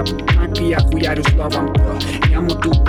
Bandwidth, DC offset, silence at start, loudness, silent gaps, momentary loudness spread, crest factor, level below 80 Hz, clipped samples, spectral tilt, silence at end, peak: 13.5 kHz; under 0.1%; 0 s; -17 LUFS; none; 2 LU; 10 dB; -18 dBFS; under 0.1%; -6.5 dB/octave; 0 s; -4 dBFS